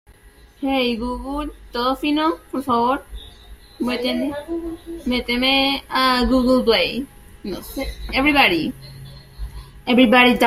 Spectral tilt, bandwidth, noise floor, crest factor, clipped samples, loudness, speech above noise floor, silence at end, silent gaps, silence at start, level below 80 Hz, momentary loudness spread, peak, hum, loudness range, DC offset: -4.5 dB/octave; 15.5 kHz; -48 dBFS; 20 dB; under 0.1%; -19 LUFS; 29 dB; 0 s; none; 0.6 s; -38 dBFS; 21 LU; 0 dBFS; none; 5 LU; under 0.1%